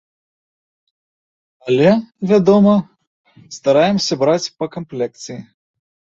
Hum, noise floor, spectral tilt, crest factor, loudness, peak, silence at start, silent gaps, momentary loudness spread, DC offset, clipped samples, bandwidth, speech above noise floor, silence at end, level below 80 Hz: none; under -90 dBFS; -6 dB/octave; 16 dB; -16 LUFS; -2 dBFS; 1.65 s; 3.07-3.24 s; 19 LU; under 0.1%; under 0.1%; 7.6 kHz; over 75 dB; 0.7 s; -58 dBFS